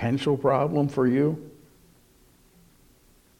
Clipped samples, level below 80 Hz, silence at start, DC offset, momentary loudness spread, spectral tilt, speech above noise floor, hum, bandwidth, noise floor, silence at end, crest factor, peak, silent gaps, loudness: under 0.1%; -60 dBFS; 0 s; under 0.1%; 4 LU; -8 dB/octave; 35 dB; none; 16 kHz; -59 dBFS; 1.9 s; 18 dB; -8 dBFS; none; -24 LUFS